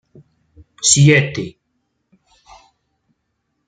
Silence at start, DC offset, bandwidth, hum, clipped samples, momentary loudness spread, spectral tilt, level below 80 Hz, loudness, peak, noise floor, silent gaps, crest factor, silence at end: 0.8 s; under 0.1%; 9.4 kHz; none; under 0.1%; 18 LU; -4 dB/octave; -52 dBFS; -13 LUFS; 0 dBFS; -71 dBFS; none; 20 dB; 2.2 s